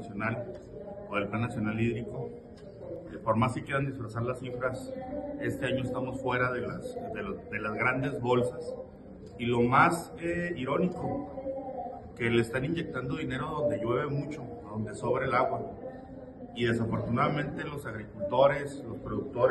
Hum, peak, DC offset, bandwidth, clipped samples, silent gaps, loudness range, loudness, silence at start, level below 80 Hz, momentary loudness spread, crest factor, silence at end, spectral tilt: none; -8 dBFS; under 0.1%; 12 kHz; under 0.1%; none; 4 LU; -31 LUFS; 0 s; -54 dBFS; 15 LU; 22 dB; 0 s; -7 dB/octave